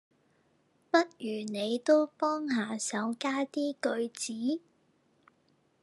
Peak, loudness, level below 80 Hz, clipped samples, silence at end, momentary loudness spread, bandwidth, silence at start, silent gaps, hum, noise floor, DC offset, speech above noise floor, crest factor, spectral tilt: -10 dBFS; -31 LUFS; under -90 dBFS; under 0.1%; 1.25 s; 9 LU; 12 kHz; 0.95 s; none; none; -70 dBFS; under 0.1%; 39 dB; 24 dB; -3.5 dB/octave